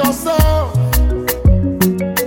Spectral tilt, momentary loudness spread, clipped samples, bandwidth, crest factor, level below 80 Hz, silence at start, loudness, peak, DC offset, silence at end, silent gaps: -6 dB/octave; 2 LU; under 0.1%; 17.5 kHz; 12 dB; -18 dBFS; 0 s; -15 LUFS; -2 dBFS; under 0.1%; 0 s; none